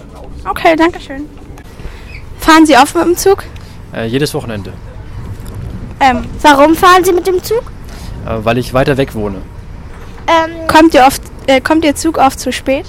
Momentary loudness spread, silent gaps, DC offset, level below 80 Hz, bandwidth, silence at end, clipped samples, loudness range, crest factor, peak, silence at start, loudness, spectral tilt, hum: 24 LU; none; under 0.1%; -30 dBFS; 17 kHz; 0 s; 0.1%; 5 LU; 12 dB; 0 dBFS; 0 s; -10 LUFS; -4.5 dB/octave; none